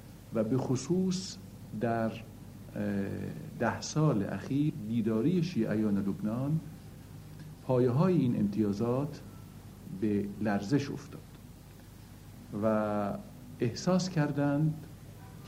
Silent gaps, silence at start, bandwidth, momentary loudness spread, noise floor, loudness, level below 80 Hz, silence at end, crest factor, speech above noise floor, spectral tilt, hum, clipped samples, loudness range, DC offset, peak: none; 0 s; 16 kHz; 20 LU; -51 dBFS; -32 LUFS; -58 dBFS; 0 s; 18 dB; 20 dB; -7 dB/octave; none; under 0.1%; 4 LU; under 0.1%; -14 dBFS